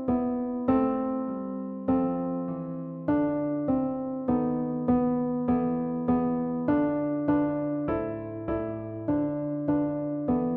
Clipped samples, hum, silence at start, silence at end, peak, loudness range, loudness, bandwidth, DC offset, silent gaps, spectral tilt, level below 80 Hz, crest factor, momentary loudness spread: under 0.1%; none; 0 s; 0 s; -12 dBFS; 2 LU; -28 LUFS; 3.4 kHz; under 0.1%; none; -9.5 dB/octave; -52 dBFS; 14 dB; 7 LU